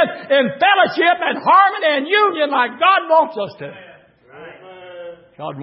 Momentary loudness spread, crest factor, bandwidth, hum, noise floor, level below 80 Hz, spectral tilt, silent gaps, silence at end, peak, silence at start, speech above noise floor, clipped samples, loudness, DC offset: 21 LU; 14 dB; 5.8 kHz; none; -45 dBFS; -72 dBFS; -8.5 dB/octave; none; 0 s; -2 dBFS; 0 s; 29 dB; under 0.1%; -15 LUFS; under 0.1%